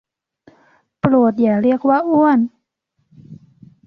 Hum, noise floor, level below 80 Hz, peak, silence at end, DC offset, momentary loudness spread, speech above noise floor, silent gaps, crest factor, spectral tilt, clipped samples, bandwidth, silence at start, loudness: none; -69 dBFS; -56 dBFS; -2 dBFS; 0.5 s; under 0.1%; 5 LU; 55 dB; none; 16 dB; -10 dB/octave; under 0.1%; 5.4 kHz; 1.05 s; -15 LUFS